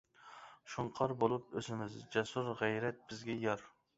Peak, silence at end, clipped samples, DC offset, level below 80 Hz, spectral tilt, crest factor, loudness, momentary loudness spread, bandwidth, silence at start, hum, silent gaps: -16 dBFS; 0.3 s; under 0.1%; under 0.1%; -72 dBFS; -4.5 dB/octave; 22 dB; -39 LUFS; 16 LU; 8 kHz; 0.2 s; none; none